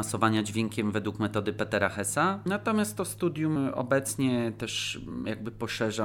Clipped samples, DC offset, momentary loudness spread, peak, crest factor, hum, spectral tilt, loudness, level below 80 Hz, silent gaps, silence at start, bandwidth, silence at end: under 0.1%; under 0.1%; 7 LU; -10 dBFS; 20 dB; none; -4.5 dB/octave; -29 LUFS; -58 dBFS; none; 0 s; 18 kHz; 0 s